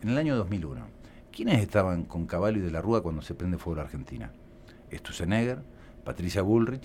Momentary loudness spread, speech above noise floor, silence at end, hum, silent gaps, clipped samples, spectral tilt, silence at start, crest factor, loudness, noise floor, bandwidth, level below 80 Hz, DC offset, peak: 18 LU; 22 dB; 0 s; none; none; under 0.1%; -7 dB/octave; 0 s; 20 dB; -29 LUFS; -50 dBFS; 15.5 kHz; -46 dBFS; under 0.1%; -10 dBFS